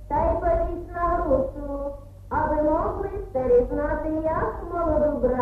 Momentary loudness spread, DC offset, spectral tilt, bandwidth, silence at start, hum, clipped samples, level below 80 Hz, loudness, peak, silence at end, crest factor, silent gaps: 10 LU; under 0.1%; -10 dB/octave; 5.2 kHz; 0 s; none; under 0.1%; -34 dBFS; -25 LUFS; -10 dBFS; 0 s; 14 dB; none